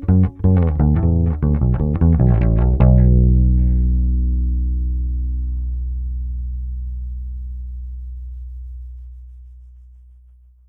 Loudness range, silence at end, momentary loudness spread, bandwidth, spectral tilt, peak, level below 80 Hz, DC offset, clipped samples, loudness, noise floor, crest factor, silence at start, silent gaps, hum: 17 LU; 1 s; 19 LU; 2.8 kHz; -13 dB/octave; 0 dBFS; -20 dBFS; under 0.1%; under 0.1%; -18 LUFS; -47 dBFS; 16 dB; 0 s; none; none